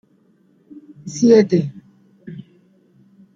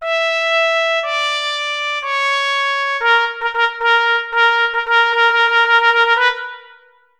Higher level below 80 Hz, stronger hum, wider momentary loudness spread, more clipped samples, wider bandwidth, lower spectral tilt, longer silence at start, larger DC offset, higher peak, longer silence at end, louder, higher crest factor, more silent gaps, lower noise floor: about the same, -64 dBFS vs -60 dBFS; neither; first, 25 LU vs 7 LU; neither; second, 7.6 kHz vs 12 kHz; first, -6.5 dB/octave vs 3 dB/octave; first, 1.05 s vs 0 s; neither; about the same, -2 dBFS vs -2 dBFS; first, 0.95 s vs 0.55 s; about the same, -15 LUFS vs -14 LUFS; about the same, 18 dB vs 14 dB; neither; first, -57 dBFS vs -48 dBFS